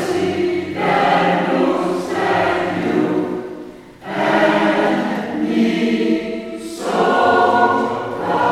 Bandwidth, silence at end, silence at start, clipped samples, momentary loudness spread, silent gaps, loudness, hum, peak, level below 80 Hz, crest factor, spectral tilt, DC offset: 14 kHz; 0 s; 0 s; under 0.1%; 12 LU; none; -17 LUFS; none; -2 dBFS; -54 dBFS; 16 dB; -5.5 dB/octave; under 0.1%